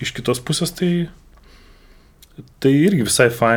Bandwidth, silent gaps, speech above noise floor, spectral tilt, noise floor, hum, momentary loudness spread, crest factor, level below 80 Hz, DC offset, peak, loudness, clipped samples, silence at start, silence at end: 19.5 kHz; none; 30 dB; -5 dB/octave; -48 dBFS; none; 8 LU; 18 dB; -48 dBFS; under 0.1%; -2 dBFS; -18 LUFS; under 0.1%; 0 s; 0 s